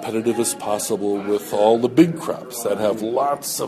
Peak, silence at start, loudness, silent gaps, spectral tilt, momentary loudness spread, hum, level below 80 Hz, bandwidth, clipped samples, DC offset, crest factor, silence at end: -2 dBFS; 0 s; -20 LUFS; none; -4.5 dB/octave; 8 LU; none; -62 dBFS; 13.5 kHz; under 0.1%; under 0.1%; 18 dB; 0 s